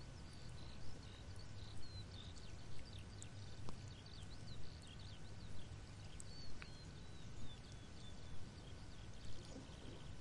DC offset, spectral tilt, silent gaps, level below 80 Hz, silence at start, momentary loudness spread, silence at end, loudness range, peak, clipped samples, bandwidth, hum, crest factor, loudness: 0.2%; -4.5 dB/octave; none; -60 dBFS; 0 s; 2 LU; 0 s; 1 LU; -32 dBFS; under 0.1%; 11 kHz; none; 18 dB; -56 LUFS